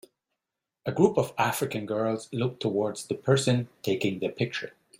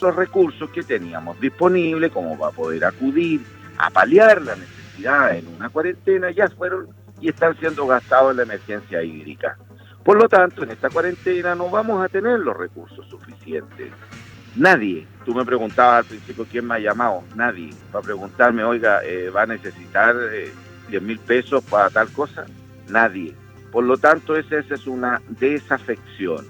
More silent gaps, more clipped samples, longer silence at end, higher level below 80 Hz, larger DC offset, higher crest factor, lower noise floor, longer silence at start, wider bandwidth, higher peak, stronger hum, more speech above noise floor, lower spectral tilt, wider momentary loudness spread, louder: neither; neither; first, 0.3 s vs 0 s; about the same, -66 dBFS vs -62 dBFS; neither; about the same, 20 dB vs 18 dB; first, -87 dBFS vs -40 dBFS; first, 0.85 s vs 0 s; second, 16 kHz vs 18.5 kHz; second, -8 dBFS vs -2 dBFS; neither; first, 60 dB vs 21 dB; about the same, -5.5 dB/octave vs -6.5 dB/octave; second, 8 LU vs 15 LU; second, -28 LUFS vs -19 LUFS